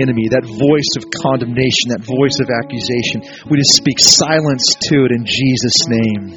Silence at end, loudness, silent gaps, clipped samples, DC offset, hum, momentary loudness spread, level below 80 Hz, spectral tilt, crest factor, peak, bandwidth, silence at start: 0 s; -12 LUFS; none; 0.1%; under 0.1%; none; 10 LU; -48 dBFS; -3.5 dB/octave; 14 dB; 0 dBFS; over 20 kHz; 0 s